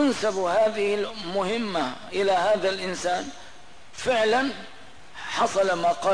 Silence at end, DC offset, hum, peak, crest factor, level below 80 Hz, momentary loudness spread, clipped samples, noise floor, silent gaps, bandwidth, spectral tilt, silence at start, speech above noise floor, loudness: 0 s; 0.8%; none; -12 dBFS; 12 dB; -60 dBFS; 17 LU; under 0.1%; -49 dBFS; none; 10.5 kHz; -3.5 dB/octave; 0 s; 25 dB; -25 LUFS